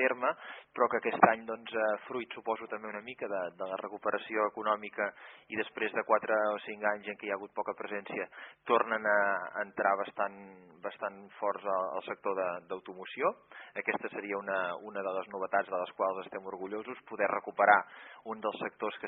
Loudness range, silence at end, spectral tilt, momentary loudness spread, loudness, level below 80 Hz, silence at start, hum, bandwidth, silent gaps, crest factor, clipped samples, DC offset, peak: 4 LU; 0 s; -2 dB/octave; 14 LU; -33 LUFS; -82 dBFS; 0 s; none; 4 kHz; none; 26 dB; under 0.1%; under 0.1%; -8 dBFS